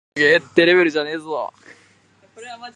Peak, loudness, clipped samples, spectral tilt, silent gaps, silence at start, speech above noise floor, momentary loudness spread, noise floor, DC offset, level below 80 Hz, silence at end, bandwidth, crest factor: 0 dBFS; -17 LUFS; under 0.1%; -5 dB/octave; none; 0.15 s; 37 dB; 19 LU; -55 dBFS; under 0.1%; -70 dBFS; 0.05 s; 10 kHz; 20 dB